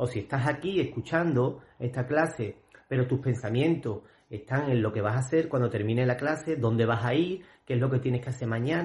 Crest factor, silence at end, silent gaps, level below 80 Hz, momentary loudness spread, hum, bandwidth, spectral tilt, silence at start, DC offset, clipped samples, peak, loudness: 18 dB; 0 s; none; -62 dBFS; 8 LU; none; 11.5 kHz; -7.5 dB/octave; 0 s; under 0.1%; under 0.1%; -10 dBFS; -28 LUFS